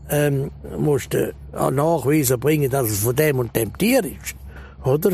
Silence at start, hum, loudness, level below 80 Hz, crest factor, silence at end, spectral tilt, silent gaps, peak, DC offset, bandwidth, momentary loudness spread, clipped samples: 0 s; none; -20 LUFS; -42 dBFS; 16 dB; 0 s; -5.5 dB/octave; none; -4 dBFS; under 0.1%; 15.5 kHz; 11 LU; under 0.1%